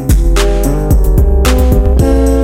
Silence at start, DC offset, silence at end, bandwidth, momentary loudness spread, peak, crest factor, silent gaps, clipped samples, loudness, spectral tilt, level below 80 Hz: 0 s; under 0.1%; 0 s; 16.5 kHz; 2 LU; 0 dBFS; 8 dB; none; under 0.1%; -11 LUFS; -6.5 dB/octave; -10 dBFS